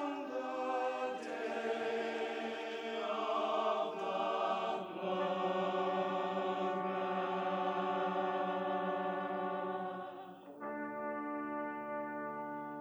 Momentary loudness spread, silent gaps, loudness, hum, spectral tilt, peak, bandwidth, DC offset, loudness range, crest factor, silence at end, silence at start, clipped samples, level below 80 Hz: 7 LU; none; -38 LUFS; none; -6 dB/octave; -24 dBFS; over 20 kHz; under 0.1%; 4 LU; 14 dB; 0 s; 0 s; under 0.1%; -86 dBFS